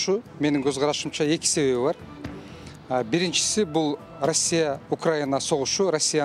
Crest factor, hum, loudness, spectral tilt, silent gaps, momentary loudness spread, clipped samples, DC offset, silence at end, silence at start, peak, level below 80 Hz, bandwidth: 16 dB; none; -24 LUFS; -3.5 dB/octave; none; 14 LU; under 0.1%; under 0.1%; 0 s; 0 s; -8 dBFS; -58 dBFS; 14.5 kHz